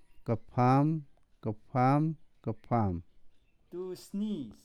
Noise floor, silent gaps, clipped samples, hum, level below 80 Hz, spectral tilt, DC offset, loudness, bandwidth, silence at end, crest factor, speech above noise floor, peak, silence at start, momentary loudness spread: -56 dBFS; none; under 0.1%; none; -60 dBFS; -9 dB/octave; under 0.1%; -32 LUFS; 12.5 kHz; 0.1 s; 18 dB; 25 dB; -14 dBFS; 0.15 s; 15 LU